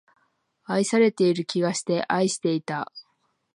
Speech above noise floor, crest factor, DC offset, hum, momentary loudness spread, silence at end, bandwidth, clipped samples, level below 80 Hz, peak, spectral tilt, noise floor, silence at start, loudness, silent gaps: 46 dB; 18 dB; under 0.1%; none; 10 LU; 0.55 s; 11 kHz; under 0.1%; -74 dBFS; -8 dBFS; -5 dB/octave; -69 dBFS; 0.7 s; -24 LUFS; none